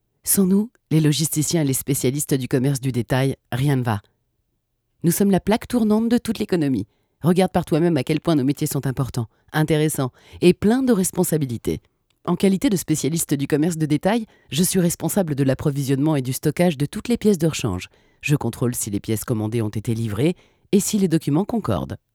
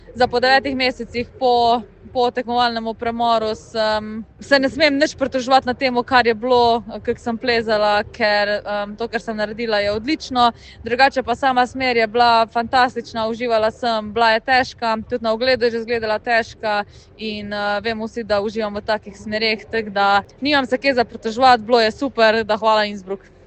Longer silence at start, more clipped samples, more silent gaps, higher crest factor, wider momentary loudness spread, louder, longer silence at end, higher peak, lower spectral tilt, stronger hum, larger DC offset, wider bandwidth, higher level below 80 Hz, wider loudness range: first, 0.25 s vs 0.1 s; neither; neither; about the same, 18 dB vs 18 dB; about the same, 7 LU vs 9 LU; second, -21 LUFS vs -18 LUFS; about the same, 0.2 s vs 0.3 s; about the same, -2 dBFS vs 0 dBFS; first, -5.5 dB/octave vs -4 dB/octave; neither; neither; first, 19.5 kHz vs 8.8 kHz; about the same, -48 dBFS vs -48 dBFS; about the same, 2 LU vs 4 LU